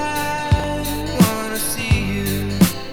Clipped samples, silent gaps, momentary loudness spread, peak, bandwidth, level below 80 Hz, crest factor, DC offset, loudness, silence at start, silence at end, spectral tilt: under 0.1%; none; 6 LU; 0 dBFS; 18.5 kHz; -30 dBFS; 18 dB; under 0.1%; -19 LUFS; 0 s; 0 s; -5 dB/octave